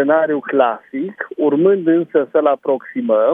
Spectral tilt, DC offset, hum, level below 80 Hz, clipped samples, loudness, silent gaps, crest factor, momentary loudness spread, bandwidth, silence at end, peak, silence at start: -9.5 dB/octave; under 0.1%; none; -74 dBFS; under 0.1%; -17 LUFS; none; 16 dB; 10 LU; 3.8 kHz; 0 s; 0 dBFS; 0 s